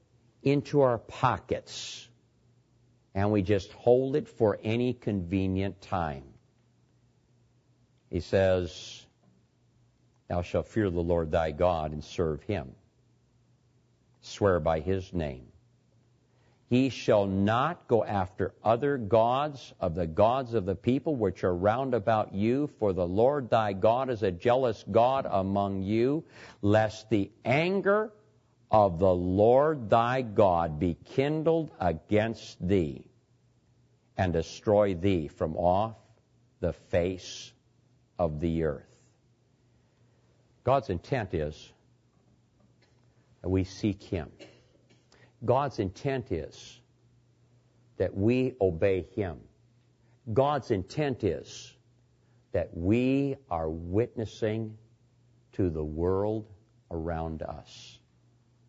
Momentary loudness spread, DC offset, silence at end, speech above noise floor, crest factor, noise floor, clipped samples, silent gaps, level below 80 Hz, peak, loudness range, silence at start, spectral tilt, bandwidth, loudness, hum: 12 LU; under 0.1%; 0.75 s; 39 dB; 20 dB; -66 dBFS; under 0.1%; none; -52 dBFS; -10 dBFS; 8 LU; 0.45 s; -7.5 dB/octave; 8 kHz; -29 LUFS; none